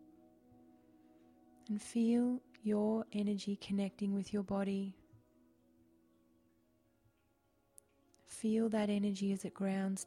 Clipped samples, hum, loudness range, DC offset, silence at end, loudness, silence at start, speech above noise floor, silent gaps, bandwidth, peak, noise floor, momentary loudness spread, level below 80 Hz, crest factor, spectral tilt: under 0.1%; none; 9 LU; under 0.1%; 0 s; -37 LUFS; 1.7 s; 40 dB; none; 12 kHz; -24 dBFS; -76 dBFS; 7 LU; -74 dBFS; 14 dB; -6.5 dB/octave